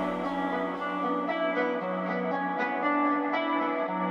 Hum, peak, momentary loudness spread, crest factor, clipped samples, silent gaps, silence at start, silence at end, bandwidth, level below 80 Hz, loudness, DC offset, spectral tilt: none; -16 dBFS; 4 LU; 14 dB; under 0.1%; none; 0 s; 0 s; 7 kHz; -66 dBFS; -29 LUFS; under 0.1%; -7 dB/octave